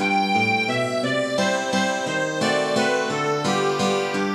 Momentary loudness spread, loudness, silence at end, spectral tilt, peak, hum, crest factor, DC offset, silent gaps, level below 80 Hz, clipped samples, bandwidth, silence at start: 3 LU; -21 LUFS; 0 s; -4 dB/octave; -8 dBFS; none; 14 dB; under 0.1%; none; -66 dBFS; under 0.1%; 14 kHz; 0 s